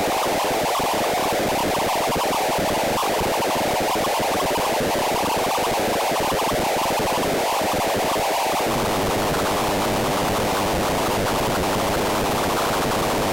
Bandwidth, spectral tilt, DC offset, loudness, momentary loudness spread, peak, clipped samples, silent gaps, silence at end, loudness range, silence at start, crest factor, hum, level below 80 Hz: 17 kHz; -3.5 dB/octave; under 0.1%; -21 LUFS; 0 LU; -16 dBFS; under 0.1%; none; 0 s; 0 LU; 0 s; 6 dB; none; -40 dBFS